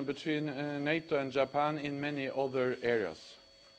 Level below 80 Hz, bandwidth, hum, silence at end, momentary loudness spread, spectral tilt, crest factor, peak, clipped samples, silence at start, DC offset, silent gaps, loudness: -74 dBFS; 8.8 kHz; none; 0.4 s; 5 LU; -6.5 dB/octave; 18 dB; -18 dBFS; under 0.1%; 0 s; under 0.1%; none; -34 LUFS